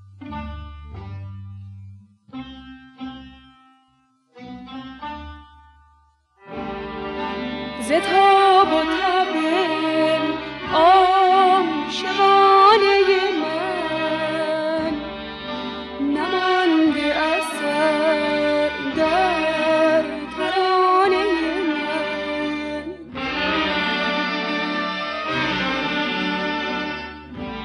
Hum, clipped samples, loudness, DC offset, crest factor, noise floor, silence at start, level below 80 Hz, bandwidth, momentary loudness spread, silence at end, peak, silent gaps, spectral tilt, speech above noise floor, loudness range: none; under 0.1%; -19 LUFS; under 0.1%; 18 dB; -62 dBFS; 0.15 s; -48 dBFS; 12.5 kHz; 21 LU; 0 s; -2 dBFS; none; -4.5 dB/octave; 45 dB; 22 LU